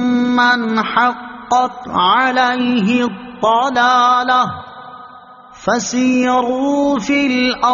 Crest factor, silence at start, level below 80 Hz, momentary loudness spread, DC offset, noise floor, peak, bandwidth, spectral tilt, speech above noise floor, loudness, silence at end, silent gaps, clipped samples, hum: 14 dB; 0 s; -52 dBFS; 9 LU; under 0.1%; -39 dBFS; 0 dBFS; 7.4 kHz; -2 dB/octave; 25 dB; -14 LUFS; 0 s; none; under 0.1%; none